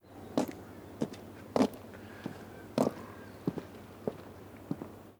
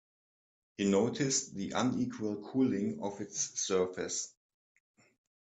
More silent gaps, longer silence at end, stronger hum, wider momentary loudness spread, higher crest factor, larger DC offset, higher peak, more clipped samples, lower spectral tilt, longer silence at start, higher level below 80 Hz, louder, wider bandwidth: neither; second, 0.05 s vs 1.2 s; neither; first, 17 LU vs 8 LU; first, 26 dB vs 18 dB; neither; first, -12 dBFS vs -16 dBFS; neither; first, -6.5 dB/octave vs -4 dB/octave; second, 0.05 s vs 0.8 s; first, -66 dBFS vs -74 dBFS; second, -37 LUFS vs -33 LUFS; first, over 20 kHz vs 9 kHz